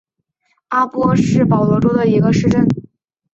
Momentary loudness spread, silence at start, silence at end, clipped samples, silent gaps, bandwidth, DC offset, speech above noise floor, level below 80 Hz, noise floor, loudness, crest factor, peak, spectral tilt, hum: 5 LU; 0.7 s; 0.5 s; under 0.1%; none; 8 kHz; under 0.1%; 53 dB; -42 dBFS; -66 dBFS; -15 LUFS; 14 dB; -2 dBFS; -8 dB/octave; none